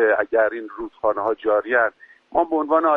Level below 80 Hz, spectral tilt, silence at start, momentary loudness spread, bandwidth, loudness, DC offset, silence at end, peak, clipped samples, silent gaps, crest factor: -58 dBFS; -7 dB/octave; 0 s; 7 LU; 4 kHz; -21 LUFS; under 0.1%; 0 s; -6 dBFS; under 0.1%; none; 14 dB